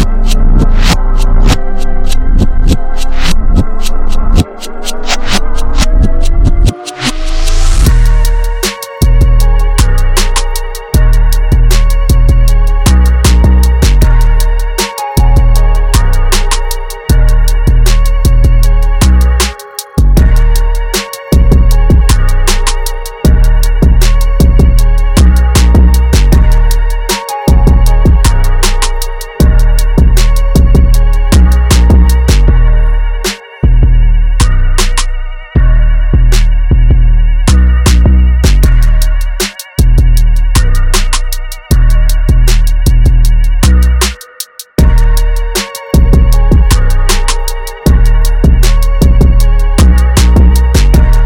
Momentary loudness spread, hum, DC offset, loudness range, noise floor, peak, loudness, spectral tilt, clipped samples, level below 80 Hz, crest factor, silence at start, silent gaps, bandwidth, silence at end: 7 LU; none; under 0.1%; 4 LU; -26 dBFS; 0 dBFS; -10 LUFS; -5 dB/octave; under 0.1%; -6 dBFS; 6 dB; 0 s; none; 17 kHz; 0 s